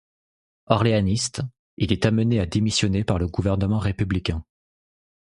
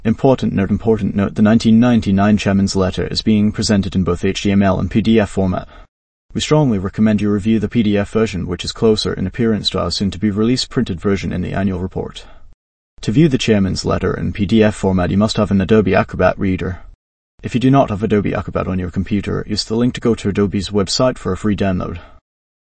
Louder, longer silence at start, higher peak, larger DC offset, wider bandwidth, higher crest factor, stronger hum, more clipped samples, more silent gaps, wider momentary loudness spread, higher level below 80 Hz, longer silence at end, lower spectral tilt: second, -23 LUFS vs -16 LUFS; first, 0.7 s vs 0 s; about the same, 0 dBFS vs 0 dBFS; neither; first, 11.5 kHz vs 8.8 kHz; first, 22 dB vs 16 dB; neither; neither; second, 1.59-1.77 s vs 5.88-6.29 s, 12.54-12.97 s, 16.95-17.38 s; about the same, 9 LU vs 7 LU; about the same, -38 dBFS vs -36 dBFS; first, 0.85 s vs 0.55 s; about the same, -5.5 dB/octave vs -6 dB/octave